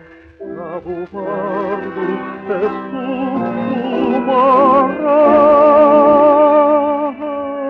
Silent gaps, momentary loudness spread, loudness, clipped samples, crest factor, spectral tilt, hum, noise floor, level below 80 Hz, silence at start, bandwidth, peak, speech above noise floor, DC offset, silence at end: none; 16 LU; -13 LUFS; under 0.1%; 12 dB; -8.5 dB/octave; none; -34 dBFS; -52 dBFS; 0.4 s; 4.7 kHz; -2 dBFS; 19 dB; under 0.1%; 0 s